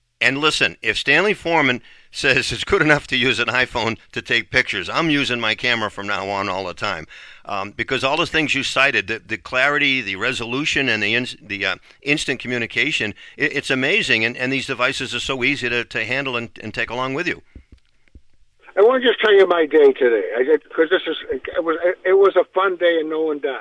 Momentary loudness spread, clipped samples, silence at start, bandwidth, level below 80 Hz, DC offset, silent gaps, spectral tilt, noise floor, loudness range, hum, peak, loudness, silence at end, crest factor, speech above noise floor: 10 LU; under 0.1%; 0.2 s; 11 kHz; -50 dBFS; under 0.1%; none; -4 dB/octave; -51 dBFS; 5 LU; none; 0 dBFS; -18 LUFS; 0 s; 18 dB; 32 dB